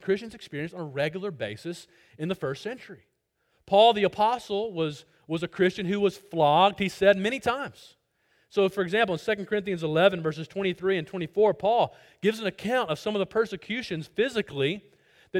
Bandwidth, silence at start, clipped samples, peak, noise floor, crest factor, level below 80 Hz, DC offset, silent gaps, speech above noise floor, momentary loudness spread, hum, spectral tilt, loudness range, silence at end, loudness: 15.5 kHz; 0 s; under 0.1%; -8 dBFS; -73 dBFS; 20 dB; -64 dBFS; under 0.1%; none; 47 dB; 13 LU; none; -5.5 dB/octave; 4 LU; 0 s; -26 LUFS